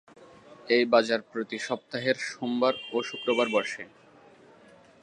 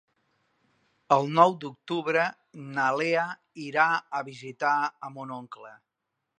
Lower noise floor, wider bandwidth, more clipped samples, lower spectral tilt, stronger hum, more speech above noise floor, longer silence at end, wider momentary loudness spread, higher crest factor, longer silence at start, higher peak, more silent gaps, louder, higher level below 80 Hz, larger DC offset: second, -55 dBFS vs -83 dBFS; first, 11 kHz vs 9.6 kHz; neither; second, -4 dB/octave vs -5.5 dB/octave; neither; second, 28 dB vs 56 dB; first, 1.15 s vs 0.65 s; second, 11 LU vs 18 LU; about the same, 22 dB vs 24 dB; second, 0.2 s vs 1.1 s; about the same, -8 dBFS vs -6 dBFS; neither; about the same, -27 LUFS vs -26 LUFS; about the same, -80 dBFS vs -82 dBFS; neither